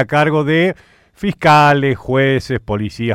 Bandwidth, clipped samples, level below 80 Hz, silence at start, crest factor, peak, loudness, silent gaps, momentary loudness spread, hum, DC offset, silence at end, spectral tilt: 14.5 kHz; under 0.1%; -42 dBFS; 0 s; 14 dB; 0 dBFS; -14 LUFS; none; 12 LU; none; under 0.1%; 0 s; -6.5 dB/octave